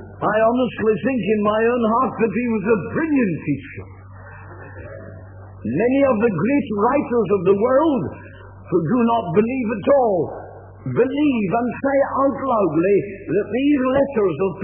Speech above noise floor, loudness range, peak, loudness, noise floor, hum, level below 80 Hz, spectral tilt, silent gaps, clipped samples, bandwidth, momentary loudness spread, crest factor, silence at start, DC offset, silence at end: 20 dB; 5 LU; -4 dBFS; -19 LUFS; -39 dBFS; none; -50 dBFS; -11.5 dB/octave; none; under 0.1%; 3.4 kHz; 19 LU; 16 dB; 0 s; under 0.1%; 0 s